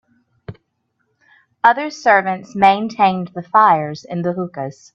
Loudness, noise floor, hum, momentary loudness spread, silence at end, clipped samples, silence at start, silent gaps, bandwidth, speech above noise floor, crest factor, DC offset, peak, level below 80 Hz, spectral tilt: -16 LUFS; -69 dBFS; none; 12 LU; 0.25 s; under 0.1%; 0.5 s; none; 7.8 kHz; 53 dB; 18 dB; under 0.1%; 0 dBFS; -62 dBFS; -6 dB/octave